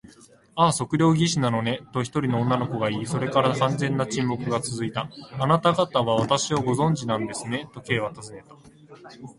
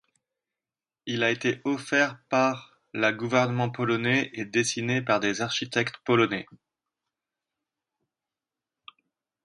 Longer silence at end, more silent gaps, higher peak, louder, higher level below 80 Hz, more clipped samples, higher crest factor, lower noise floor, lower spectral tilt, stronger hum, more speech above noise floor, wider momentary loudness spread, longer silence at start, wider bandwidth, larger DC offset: second, 0.05 s vs 3 s; neither; about the same, -6 dBFS vs -8 dBFS; about the same, -24 LUFS vs -26 LUFS; first, -56 dBFS vs -70 dBFS; neither; about the same, 18 dB vs 22 dB; second, -52 dBFS vs under -90 dBFS; about the same, -5.5 dB/octave vs -4.5 dB/octave; neither; second, 28 dB vs over 64 dB; first, 10 LU vs 5 LU; second, 0.55 s vs 1.05 s; about the same, 11.5 kHz vs 11.5 kHz; neither